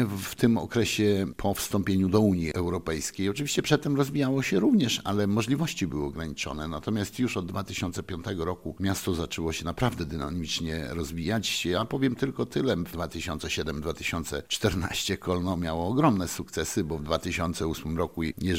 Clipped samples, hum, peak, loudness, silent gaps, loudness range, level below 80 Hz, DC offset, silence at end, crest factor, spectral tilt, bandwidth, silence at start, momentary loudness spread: under 0.1%; none; -8 dBFS; -28 LUFS; none; 5 LU; -48 dBFS; 0.2%; 0 s; 20 dB; -5 dB/octave; 16.5 kHz; 0 s; 8 LU